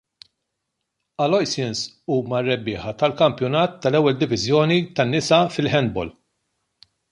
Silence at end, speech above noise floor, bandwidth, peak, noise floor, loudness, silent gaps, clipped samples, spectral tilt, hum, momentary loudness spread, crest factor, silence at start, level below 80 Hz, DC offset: 1 s; 58 dB; 11.5 kHz; -4 dBFS; -78 dBFS; -20 LUFS; none; under 0.1%; -5.5 dB/octave; none; 8 LU; 18 dB; 1.2 s; -54 dBFS; under 0.1%